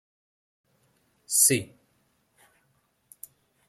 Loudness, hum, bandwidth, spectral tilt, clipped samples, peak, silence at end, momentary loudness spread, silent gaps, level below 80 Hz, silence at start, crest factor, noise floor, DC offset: -21 LUFS; none; 16.5 kHz; -2 dB/octave; under 0.1%; -6 dBFS; 2.05 s; 27 LU; none; -74 dBFS; 1.3 s; 26 dB; -70 dBFS; under 0.1%